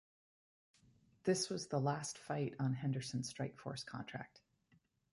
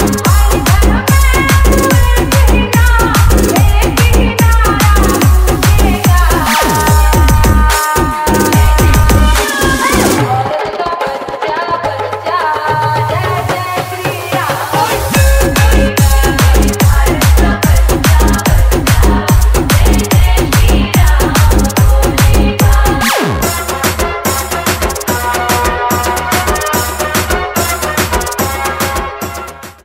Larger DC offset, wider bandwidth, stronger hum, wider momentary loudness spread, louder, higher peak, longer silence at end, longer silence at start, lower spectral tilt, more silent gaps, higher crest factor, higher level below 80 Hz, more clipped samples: neither; second, 11.5 kHz vs 16.5 kHz; neither; first, 10 LU vs 6 LU; second, -41 LUFS vs -11 LUFS; second, -24 dBFS vs 0 dBFS; first, 0.75 s vs 0.15 s; first, 1.25 s vs 0 s; about the same, -5 dB/octave vs -4.5 dB/octave; neither; first, 20 dB vs 10 dB; second, -76 dBFS vs -12 dBFS; neither